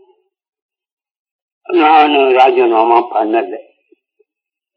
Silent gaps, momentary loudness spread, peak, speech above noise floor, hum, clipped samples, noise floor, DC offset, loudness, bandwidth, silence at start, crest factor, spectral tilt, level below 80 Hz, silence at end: none; 9 LU; 0 dBFS; 73 dB; none; under 0.1%; -84 dBFS; under 0.1%; -11 LUFS; 6.4 kHz; 1.7 s; 14 dB; 0 dB/octave; -74 dBFS; 1.15 s